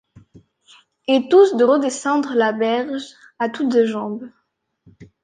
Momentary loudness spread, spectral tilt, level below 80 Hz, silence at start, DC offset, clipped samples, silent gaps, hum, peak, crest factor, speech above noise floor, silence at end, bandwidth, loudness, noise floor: 16 LU; -4.5 dB/octave; -66 dBFS; 1.1 s; under 0.1%; under 0.1%; none; none; -2 dBFS; 18 dB; 39 dB; 0.2 s; 9.6 kHz; -18 LUFS; -56 dBFS